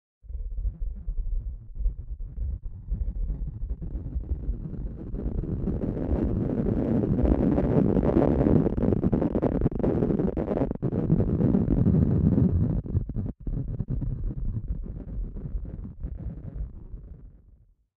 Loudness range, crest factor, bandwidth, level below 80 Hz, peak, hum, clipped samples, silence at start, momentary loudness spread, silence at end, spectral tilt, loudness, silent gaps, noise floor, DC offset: 12 LU; 20 dB; 3.8 kHz; -32 dBFS; -6 dBFS; none; under 0.1%; 0.25 s; 15 LU; 0.6 s; -12.5 dB/octave; -27 LUFS; none; -57 dBFS; under 0.1%